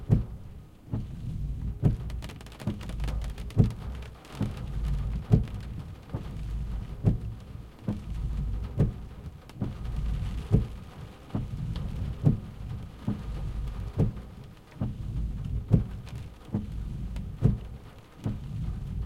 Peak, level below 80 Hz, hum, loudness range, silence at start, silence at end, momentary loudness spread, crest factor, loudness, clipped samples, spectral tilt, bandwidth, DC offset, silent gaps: -6 dBFS; -36 dBFS; none; 3 LU; 0 s; 0 s; 15 LU; 24 dB; -33 LUFS; under 0.1%; -8.5 dB/octave; 12.5 kHz; under 0.1%; none